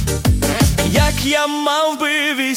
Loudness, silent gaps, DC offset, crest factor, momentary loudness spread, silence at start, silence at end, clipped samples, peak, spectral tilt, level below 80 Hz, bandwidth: -16 LUFS; none; under 0.1%; 14 dB; 2 LU; 0 s; 0 s; under 0.1%; -2 dBFS; -4 dB/octave; -26 dBFS; 17 kHz